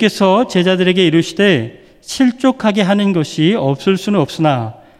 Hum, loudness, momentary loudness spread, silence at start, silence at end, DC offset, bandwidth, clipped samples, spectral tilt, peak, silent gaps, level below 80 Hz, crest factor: none; -14 LUFS; 4 LU; 0 s; 0.25 s; under 0.1%; 14 kHz; under 0.1%; -6 dB/octave; 0 dBFS; none; -54 dBFS; 14 dB